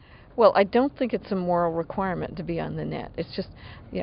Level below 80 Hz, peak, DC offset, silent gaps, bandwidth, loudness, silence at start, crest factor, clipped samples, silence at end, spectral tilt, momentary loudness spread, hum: -50 dBFS; -4 dBFS; under 0.1%; none; 5.6 kHz; -25 LUFS; 0.35 s; 22 dB; under 0.1%; 0 s; -5.5 dB/octave; 16 LU; none